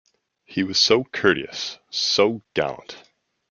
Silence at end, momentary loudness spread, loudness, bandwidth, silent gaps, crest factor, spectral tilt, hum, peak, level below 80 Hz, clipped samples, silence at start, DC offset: 0.5 s; 13 LU; -21 LUFS; 7.2 kHz; none; 22 dB; -3 dB/octave; none; -2 dBFS; -62 dBFS; under 0.1%; 0.5 s; under 0.1%